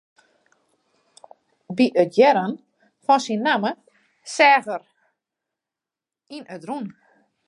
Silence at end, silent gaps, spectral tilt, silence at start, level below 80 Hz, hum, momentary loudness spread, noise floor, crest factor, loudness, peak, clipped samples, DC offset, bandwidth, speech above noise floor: 0.6 s; none; -4.5 dB/octave; 1.7 s; -80 dBFS; none; 22 LU; -89 dBFS; 20 dB; -20 LUFS; -4 dBFS; under 0.1%; under 0.1%; 11.5 kHz; 69 dB